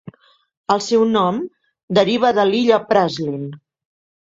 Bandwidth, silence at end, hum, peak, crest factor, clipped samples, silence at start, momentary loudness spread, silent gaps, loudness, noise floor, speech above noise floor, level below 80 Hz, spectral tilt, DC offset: 7.8 kHz; 0.65 s; none; -2 dBFS; 18 dB; under 0.1%; 0.05 s; 14 LU; 0.57-0.64 s, 1.83-1.88 s; -17 LUFS; -42 dBFS; 26 dB; -60 dBFS; -5.5 dB/octave; under 0.1%